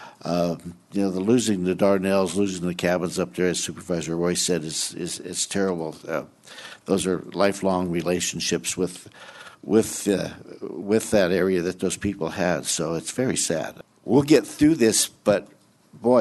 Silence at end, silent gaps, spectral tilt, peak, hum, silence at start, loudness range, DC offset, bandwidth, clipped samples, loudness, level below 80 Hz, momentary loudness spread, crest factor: 0 s; none; -4.5 dB/octave; -4 dBFS; none; 0 s; 4 LU; under 0.1%; 12.5 kHz; under 0.1%; -23 LUFS; -56 dBFS; 13 LU; 20 dB